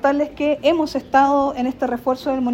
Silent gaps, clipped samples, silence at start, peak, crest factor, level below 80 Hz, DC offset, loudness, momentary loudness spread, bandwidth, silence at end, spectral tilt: none; under 0.1%; 0 s; -2 dBFS; 16 dB; -50 dBFS; under 0.1%; -19 LUFS; 6 LU; 16 kHz; 0 s; -5 dB/octave